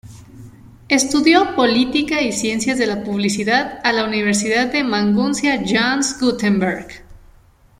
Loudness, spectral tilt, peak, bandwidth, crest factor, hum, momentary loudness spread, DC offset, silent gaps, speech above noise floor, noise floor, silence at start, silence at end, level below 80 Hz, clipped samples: -17 LUFS; -3.5 dB/octave; -2 dBFS; 15 kHz; 16 dB; none; 6 LU; under 0.1%; none; 32 dB; -49 dBFS; 0.05 s; 0.65 s; -48 dBFS; under 0.1%